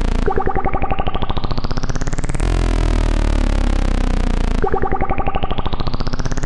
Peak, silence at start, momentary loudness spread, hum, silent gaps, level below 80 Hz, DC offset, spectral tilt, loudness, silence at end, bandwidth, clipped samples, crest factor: -4 dBFS; 0 s; 5 LU; none; none; -18 dBFS; under 0.1%; -6 dB/octave; -21 LUFS; 0 s; 10.5 kHz; under 0.1%; 12 dB